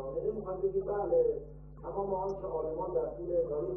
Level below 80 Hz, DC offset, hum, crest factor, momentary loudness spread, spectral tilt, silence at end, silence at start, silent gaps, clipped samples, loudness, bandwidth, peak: -52 dBFS; under 0.1%; none; 14 dB; 10 LU; -10.5 dB/octave; 0 s; 0 s; none; under 0.1%; -34 LUFS; 5.6 kHz; -20 dBFS